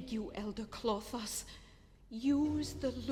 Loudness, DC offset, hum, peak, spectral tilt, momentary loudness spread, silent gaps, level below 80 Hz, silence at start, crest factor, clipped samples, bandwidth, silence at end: -38 LUFS; under 0.1%; none; -20 dBFS; -4.5 dB/octave; 13 LU; none; -56 dBFS; 0 s; 18 dB; under 0.1%; 17.5 kHz; 0 s